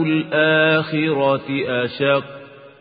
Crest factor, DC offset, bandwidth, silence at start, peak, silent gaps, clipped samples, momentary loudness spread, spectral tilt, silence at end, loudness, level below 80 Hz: 16 dB; under 0.1%; 5 kHz; 0 s; -4 dBFS; none; under 0.1%; 7 LU; -11 dB/octave; 0.15 s; -18 LUFS; -62 dBFS